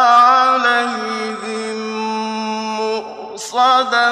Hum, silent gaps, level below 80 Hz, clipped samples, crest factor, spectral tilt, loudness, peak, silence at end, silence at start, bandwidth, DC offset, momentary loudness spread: none; none; -68 dBFS; under 0.1%; 14 dB; -2.5 dB/octave; -16 LUFS; 0 dBFS; 0 s; 0 s; 13 kHz; under 0.1%; 13 LU